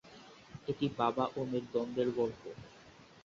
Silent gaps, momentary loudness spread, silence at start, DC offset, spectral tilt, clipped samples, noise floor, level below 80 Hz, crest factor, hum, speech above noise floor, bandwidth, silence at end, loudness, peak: none; 22 LU; 0.05 s; under 0.1%; -5.5 dB/octave; under 0.1%; -58 dBFS; -68 dBFS; 20 dB; none; 23 dB; 7.6 kHz; 0.05 s; -35 LUFS; -16 dBFS